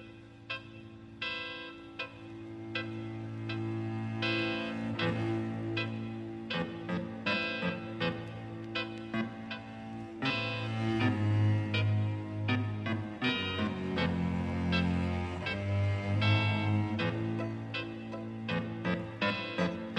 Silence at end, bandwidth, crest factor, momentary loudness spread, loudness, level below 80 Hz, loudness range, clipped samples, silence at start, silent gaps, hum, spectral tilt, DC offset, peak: 0 s; 8.4 kHz; 18 dB; 12 LU; -34 LUFS; -62 dBFS; 5 LU; under 0.1%; 0 s; none; none; -7 dB/octave; under 0.1%; -16 dBFS